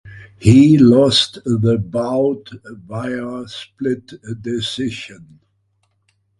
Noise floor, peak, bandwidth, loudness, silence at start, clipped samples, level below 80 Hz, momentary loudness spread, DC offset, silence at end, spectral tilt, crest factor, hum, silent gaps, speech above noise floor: -65 dBFS; 0 dBFS; 11.5 kHz; -15 LUFS; 0.05 s; under 0.1%; -42 dBFS; 21 LU; under 0.1%; 1.25 s; -6.5 dB/octave; 16 dB; none; none; 49 dB